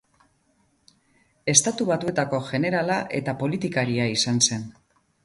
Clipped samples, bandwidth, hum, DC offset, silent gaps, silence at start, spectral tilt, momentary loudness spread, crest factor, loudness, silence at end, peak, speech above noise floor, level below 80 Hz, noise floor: under 0.1%; 11.5 kHz; none; under 0.1%; none; 1.45 s; -3.5 dB/octave; 9 LU; 24 dB; -23 LUFS; 0.55 s; -2 dBFS; 42 dB; -60 dBFS; -66 dBFS